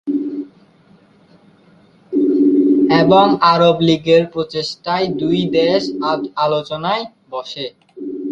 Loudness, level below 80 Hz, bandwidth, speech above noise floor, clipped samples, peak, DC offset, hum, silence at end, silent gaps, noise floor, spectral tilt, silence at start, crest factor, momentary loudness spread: -15 LUFS; -56 dBFS; 7.8 kHz; 35 dB; under 0.1%; 0 dBFS; under 0.1%; none; 0 s; none; -50 dBFS; -6.5 dB/octave; 0.05 s; 16 dB; 16 LU